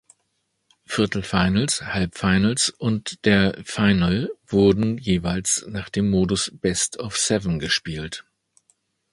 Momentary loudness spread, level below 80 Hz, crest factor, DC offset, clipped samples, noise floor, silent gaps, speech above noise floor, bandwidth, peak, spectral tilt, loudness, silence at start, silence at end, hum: 7 LU; -42 dBFS; 20 dB; under 0.1%; under 0.1%; -73 dBFS; none; 51 dB; 11.5 kHz; -2 dBFS; -4.5 dB/octave; -22 LUFS; 0.9 s; 0.9 s; none